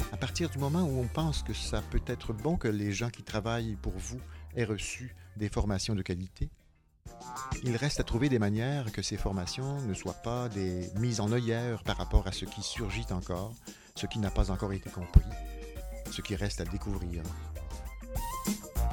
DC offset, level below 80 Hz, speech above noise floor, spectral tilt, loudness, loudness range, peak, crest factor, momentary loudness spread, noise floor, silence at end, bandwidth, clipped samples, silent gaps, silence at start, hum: under 0.1%; -38 dBFS; 22 dB; -5.5 dB/octave; -34 LUFS; 4 LU; -6 dBFS; 26 dB; 12 LU; -54 dBFS; 0 s; 18 kHz; under 0.1%; none; 0 s; none